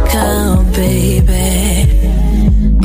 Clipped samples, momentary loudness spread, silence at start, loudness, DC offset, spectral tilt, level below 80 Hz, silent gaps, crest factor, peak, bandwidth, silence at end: under 0.1%; 1 LU; 0 s; -12 LUFS; under 0.1%; -5.5 dB/octave; -12 dBFS; none; 8 dB; -2 dBFS; 16 kHz; 0 s